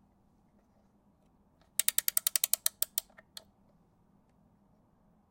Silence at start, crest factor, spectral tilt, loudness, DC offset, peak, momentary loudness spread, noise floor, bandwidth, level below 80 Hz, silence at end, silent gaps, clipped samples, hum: 1.8 s; 32 dB; 2.5 dB/octave; -30 LUFS; under 0.1%; -6 dBFS; 23 LU; -68 dBFS; 17 kHz; -76 dBFS; 2.3 s; none; under 0.1%; none